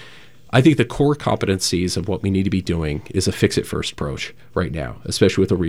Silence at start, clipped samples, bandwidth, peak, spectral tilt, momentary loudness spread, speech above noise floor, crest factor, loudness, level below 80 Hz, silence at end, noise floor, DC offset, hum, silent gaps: 0 s; under 0.1%; 16 kHz; -2 dBFS; -5.5 dB/octave; 10 LU; 26 dB; 18 dB; -20 LUFS; -42 dBFS; 0 s; -46 dBFS; 0.6%; none; none